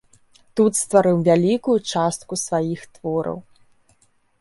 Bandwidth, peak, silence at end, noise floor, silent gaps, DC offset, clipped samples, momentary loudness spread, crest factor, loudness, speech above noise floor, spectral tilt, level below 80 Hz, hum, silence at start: 12 kHz; -2 dBFS; 1 s; -61 dBFS; none; under 0.1%; under 0.1%; 13 LU; 18 dB; -20 LUFS; 41 dB; -5.5 dB/octave; -62 dBFS; none; 0.55 s